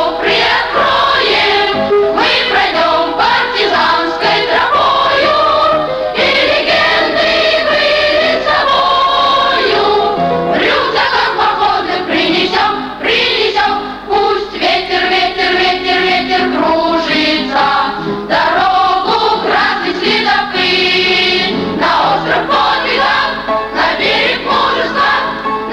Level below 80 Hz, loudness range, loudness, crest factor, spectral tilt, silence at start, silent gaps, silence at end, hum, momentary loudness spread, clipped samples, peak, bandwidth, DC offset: -42 dBFS; 2 LU; -11 LUFS; 12 dB; -4 dB/octave; 0 s; none; 0 s; none; 4 LU; under 0.1%; 0 dBFS; 15.5 kHz; under 0.1%